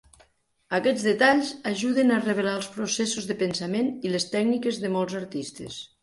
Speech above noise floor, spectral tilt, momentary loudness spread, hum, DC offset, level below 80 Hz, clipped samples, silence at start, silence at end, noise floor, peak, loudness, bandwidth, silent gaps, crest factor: 37 dB; -4 dB/octave; 11 LU; none; under 0.1%; -66 dBFS; under 0.1%; 0.7 s; 0.15 s; -62 dBFS; -6 dBFS; -25 LUFS; 11.5 kHz; none; 18 dB